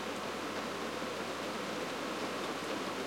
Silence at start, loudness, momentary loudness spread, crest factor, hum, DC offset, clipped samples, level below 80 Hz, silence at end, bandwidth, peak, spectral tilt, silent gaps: 0 s; -38 LUFS; 1 LU; 14 dB; none; under 0.1%; under 0.1%; -78 dBFS; 0 s; 16.5 kHz; -24 dBFS; -3.5 dB/octave; none